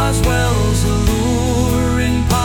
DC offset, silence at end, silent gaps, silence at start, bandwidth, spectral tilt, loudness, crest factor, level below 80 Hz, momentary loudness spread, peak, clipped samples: 0.2%; 0 s; none; 0 s; 19 kHz; -5.5 dB/octave; -16 LUFS; 10 dB; -22 dBFS; 1 LU; -4 dBFS; under 0.1%